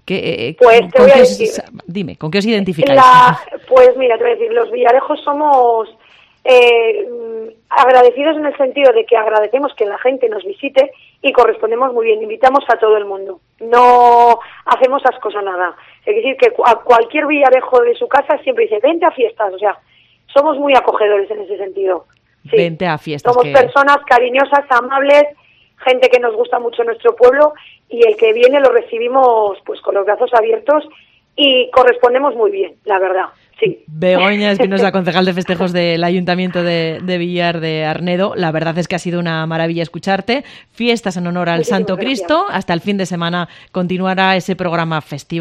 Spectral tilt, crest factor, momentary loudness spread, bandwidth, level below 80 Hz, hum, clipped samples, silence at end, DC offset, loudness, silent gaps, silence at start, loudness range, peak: -5.5 dB/octave; 12 dB; 11 LU; 10.5 kHz; -54 dBFS; none; 0.4%; 0 s; under 0.1%; -12 LUFS; none; 0.05 s; 6 LU; 0 dBFS